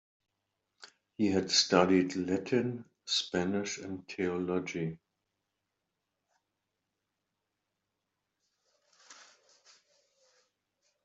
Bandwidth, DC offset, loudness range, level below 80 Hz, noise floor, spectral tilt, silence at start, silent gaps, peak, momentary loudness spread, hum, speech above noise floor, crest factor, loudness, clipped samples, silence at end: 8.2 kHz; under 0.1%; 11 LU; -76 dBFS; -85 dBFS; -4 dB/octave; 0.8 s; none; -10 dBFS; 15 LU; none; 55 dB; 26 dB; -31 LUFS; under 0.1%; 1.8 s